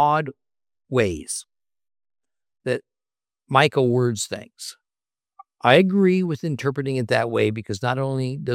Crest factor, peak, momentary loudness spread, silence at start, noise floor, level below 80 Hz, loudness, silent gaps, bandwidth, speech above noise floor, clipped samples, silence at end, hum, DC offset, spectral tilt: 22 dB; 0 dBFS; 14 LU; 0 s; under -90 dBFS; -60 dBFS; -22 LUFS; none; 15.5 kHz; over 69 dB; under 0.1%; 0 s; none; under 0.1%; -5.5 dB/octave